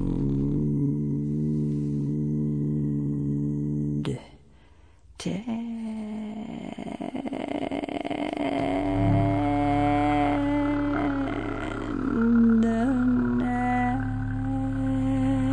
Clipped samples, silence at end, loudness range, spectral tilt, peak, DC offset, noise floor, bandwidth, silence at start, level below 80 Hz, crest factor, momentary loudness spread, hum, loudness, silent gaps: under 0.1%; 0 s; 9 LU; -8.5 dB/octave; -12 dBFS; 0.1%; -55 dBFS; 10 kHz; 0 s; -40 dBFS; 14 dB; 10 LU; none; -26 LUFS; none